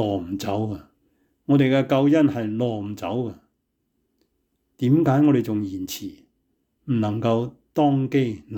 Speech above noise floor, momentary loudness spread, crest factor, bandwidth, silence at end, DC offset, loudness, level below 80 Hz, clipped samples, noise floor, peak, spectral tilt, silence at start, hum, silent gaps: 52 dB; 13 LU; 14 dB; 18 kHz; 0 s; under 0.1%; -22 LUFS; -62 dBFS; under 0.1%; -74 dBFS; -8 dBFS; -7.5 dB/octave; 0 s; none; none